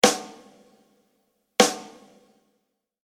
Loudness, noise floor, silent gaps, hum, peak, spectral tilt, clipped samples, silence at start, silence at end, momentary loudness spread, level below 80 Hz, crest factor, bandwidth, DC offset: -22 LUFS; -76 dBFS; none; none; 0 dBFS; -2 dB/octave; under 0.1%; 0.05 s; 1.25 s; 23 LU; -68 dBFS; 28 dB; 18 kHz; under 0.1%